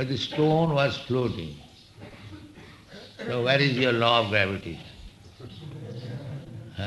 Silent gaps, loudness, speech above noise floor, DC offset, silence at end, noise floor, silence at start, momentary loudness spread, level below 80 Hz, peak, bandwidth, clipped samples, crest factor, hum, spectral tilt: none; -24 LUFS; 23 dB; under 0.1%; 0 s; -48 dBFS; 0 s; 24 LU; -54 dBFS; -8 dBFS; 12 kHz; under 0.1%; 20 dB; none; -6 dB/octave